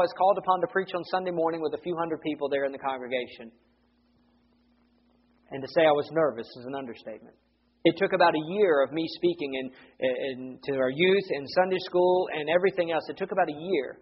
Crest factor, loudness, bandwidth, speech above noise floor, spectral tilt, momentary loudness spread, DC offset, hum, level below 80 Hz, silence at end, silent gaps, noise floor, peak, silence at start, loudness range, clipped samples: 22 dB; -27 LUFS; 5.8 kHz; 39 dB; -3.5 dB/octave; 14 LU; under 0.1%; none; -70 dBFS; 0.1 s; none; -66 dBFS; -6 dBFS; 0 s; 7 LU; under 0.1%